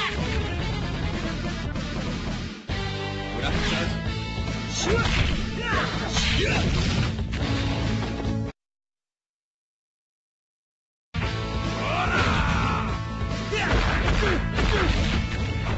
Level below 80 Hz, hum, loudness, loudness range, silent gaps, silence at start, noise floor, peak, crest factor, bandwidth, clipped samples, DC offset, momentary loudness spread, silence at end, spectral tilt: -32 dBFS; none; -26 LUFS; 8 LU; 9.29-11.12 s; 0 s; under -90 dBFS; -8 dBFS; 16 dB; 8.2 kHz; under 0.1%; under 0.1%; 7 LU; 0 s; -5 dB/octave